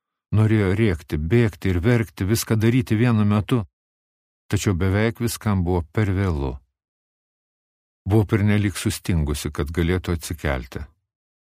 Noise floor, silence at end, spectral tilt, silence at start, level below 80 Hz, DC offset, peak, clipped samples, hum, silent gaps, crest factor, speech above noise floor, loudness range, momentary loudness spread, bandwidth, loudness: under -90 dBFS; 0.55 s; -6.5 dB/octave; 0.3 s; -36 dBFS; under 0.1%; -4 dBFS; under 0.1%; none; 3.73-4.49 s, 6.88-8.05 s; 18 dB; over 70 dB; 4 LU; 8 LU; 15.5 kHz; -22 LUFS